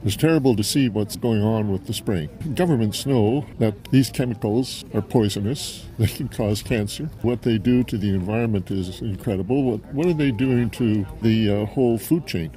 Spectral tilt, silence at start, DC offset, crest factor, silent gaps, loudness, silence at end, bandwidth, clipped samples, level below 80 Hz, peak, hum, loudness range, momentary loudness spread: -6.5 dB/octave; 0 s; under 0.1%; 18 dB; none; -22 LUFS; 0 s; 16 kHz; under 0.1%; -44 dBFS; -4 dBFS; none; 2 LU; 7 LU